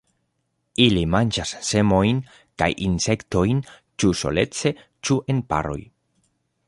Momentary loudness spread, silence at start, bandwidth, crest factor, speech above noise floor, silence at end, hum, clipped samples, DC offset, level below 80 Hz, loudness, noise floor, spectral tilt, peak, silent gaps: 11 LU; 0.8 s; 11.5 kHz; 20 dB; 52 dB; 0.85 s; none; under 0.1%; under 0.1%; -42 dBFS; -22 LUFS; -73 dBFS; -5 dB/octave; -2 dBFS; none